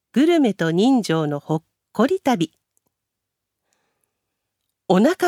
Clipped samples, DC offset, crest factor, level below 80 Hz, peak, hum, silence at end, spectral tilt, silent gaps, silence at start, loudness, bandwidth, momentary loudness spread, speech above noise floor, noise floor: under 0.1%; under 0.1%; 18 dB; -70 dBFS; -2 dBFS; none; 0 s; -6 dB/octave; none; 0.15 s; -20 LUFS; 15.5 kHz; 10 LU; 63 dB; -81 dBFS